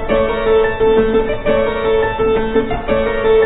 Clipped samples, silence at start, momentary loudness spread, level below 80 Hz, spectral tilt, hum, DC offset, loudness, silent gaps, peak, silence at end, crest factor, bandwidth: under 0.1%; 0 s; 4 LU; -28 dBFS; -10 dB/octave; none; under 0.1%; -15 LUFS; none; -2 dBFS; 0 s; 12 dB; 4 kHz